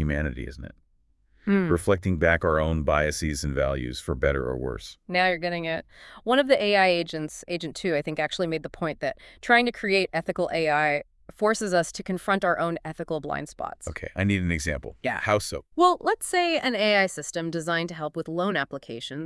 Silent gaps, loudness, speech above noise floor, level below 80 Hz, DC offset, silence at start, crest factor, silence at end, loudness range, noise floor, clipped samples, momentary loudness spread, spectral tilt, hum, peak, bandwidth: none; -25 LUFS; 38 dB; -44 dBFS; under 0.1%; 0 s; 20 dB; 0 s; 3 LU; -64 dBFS; under 0.1%; 12 LU; -5 dB/octave; none; -6 dBFS; 12 kHz